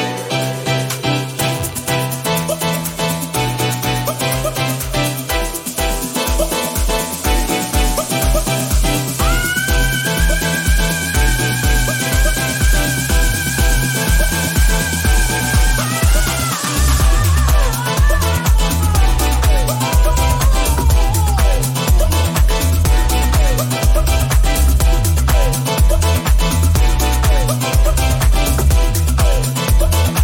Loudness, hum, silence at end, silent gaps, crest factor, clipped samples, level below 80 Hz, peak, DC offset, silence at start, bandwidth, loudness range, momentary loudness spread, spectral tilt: -16 LUFS; none; 0 s; none; 10 dB; under 0.1%; -16 dBFS; -2 dBFS; under 0.1%; 0 s; 17 kHz; 3 LU; 4 LU; -4 dB/octave